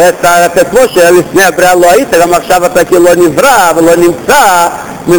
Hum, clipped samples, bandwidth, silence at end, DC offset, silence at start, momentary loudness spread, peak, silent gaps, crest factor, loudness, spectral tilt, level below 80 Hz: none; 4%; over 20 kHz; 0 s; 2%; 0 s; 3 LU; 0 dBFS; none; 6 dB; -5 LUFS; -3.5 dB/octave; -36 dBFS